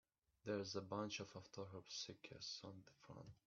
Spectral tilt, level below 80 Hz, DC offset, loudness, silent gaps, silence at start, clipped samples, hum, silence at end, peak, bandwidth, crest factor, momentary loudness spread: -3.5 dB/octave; -82 dBFS; under 0.1%; -51 LUFS; none; 0.45 s; under 0.1%; none; 0.1 s; -32 dBFS; 7.2 kHz; 20 dB; 14 LU